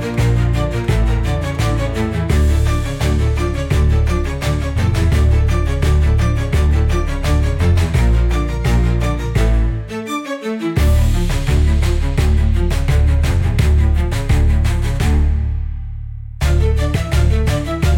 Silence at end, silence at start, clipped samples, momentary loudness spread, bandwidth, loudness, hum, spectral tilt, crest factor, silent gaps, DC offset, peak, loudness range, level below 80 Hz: 0 s; 0 s; under 0.1%; 5 LU; 16 kHz; -17 LUFS; none; -6.5 dB/octave; 10 dB; none; under 0.1%; -4 dBFS; 2 LU; -18 dBFS